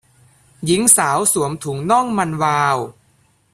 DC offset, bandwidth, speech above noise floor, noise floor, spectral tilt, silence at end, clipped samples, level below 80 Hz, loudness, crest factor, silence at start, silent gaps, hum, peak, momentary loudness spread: under 0.1%; 16 kHz; 41 dB; -58 dBFS; -3.5 dB/octave; 0.6 s; under 0.1%; -56 dBFS; -16 LUFS; 18 dB; 0.6 s; none; none; 0 dBFS; 12 LU